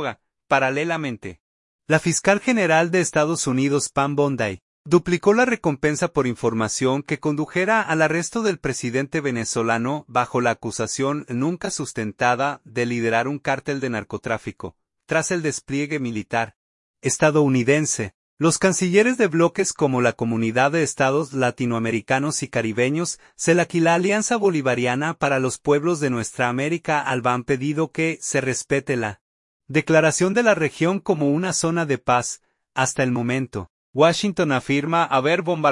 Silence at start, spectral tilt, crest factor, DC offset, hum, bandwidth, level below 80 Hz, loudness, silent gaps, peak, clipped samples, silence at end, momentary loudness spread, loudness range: 0 s; -4.5 dB/octave; 18 dB; under 0.1%; none; 11.5 kHz; -58 dBFS; -21 LUFS; 1.40-1.79 s, 4.62-4.84 s, 16.56-16.94 s, 18.14-18.37 s, 29.21-29.60 s, 33.70-33.93 s; -2 dBFS; under 0.1%; 0 s; 8 LU; 4 LU